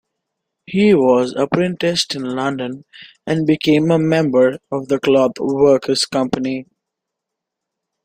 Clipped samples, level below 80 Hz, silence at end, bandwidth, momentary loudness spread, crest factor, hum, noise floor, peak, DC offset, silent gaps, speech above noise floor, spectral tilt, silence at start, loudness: under 0.1%; -56 dBFS; 1.4 s; 15.5 kHz; 10 LU; 16 dB; none; -81 dBFS; -2 dBFS; under 0.1%; none; 65 dB; -5.5 dB/octave; 0.7 s; -16 LUFS